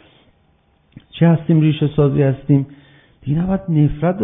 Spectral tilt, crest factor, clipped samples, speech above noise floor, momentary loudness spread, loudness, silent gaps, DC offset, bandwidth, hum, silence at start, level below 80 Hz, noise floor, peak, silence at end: -13.5 dB/octave; 16 dB; under 0.1%; 43 dB; 10 LU; -16 LUFS; none; under 0.1%; 3.8 kHz; none; 1.15 s; -40 dBFS; -58 dBFS; 0 dBFS; 0 s